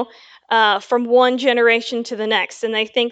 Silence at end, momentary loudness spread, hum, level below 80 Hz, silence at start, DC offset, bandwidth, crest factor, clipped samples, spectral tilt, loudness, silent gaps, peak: 0 s; 8 LU; none; -76 dBFS; 0 s; under 0.1%; 8.2 kHz; 16 dB; under 0.1%; -3 dB/octave; -17 LUFS; none; -2 dBFS